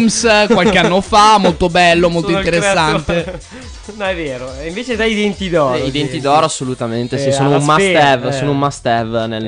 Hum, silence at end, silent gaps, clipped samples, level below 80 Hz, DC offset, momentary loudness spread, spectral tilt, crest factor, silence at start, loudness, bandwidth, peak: none; 0 s; none; under 0.1%; -36 dBFS; under 0.1%; 12 LU; -4.5 dB/octave; 12 dB; 0 s; -13 LUFS; 10.5 kHz; -2 dBFS